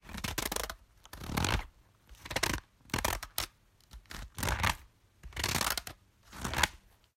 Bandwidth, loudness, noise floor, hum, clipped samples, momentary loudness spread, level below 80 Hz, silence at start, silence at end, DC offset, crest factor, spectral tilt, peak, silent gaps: 16.5 kHz; -34 LUFS; -59 dBFS; none; under 0.1%; 17 LU; -46 dBFS; 0.05 s; 0.4 s; under 0.1%; 30 dB; -2.5 dB/octave; -8 dBFS; none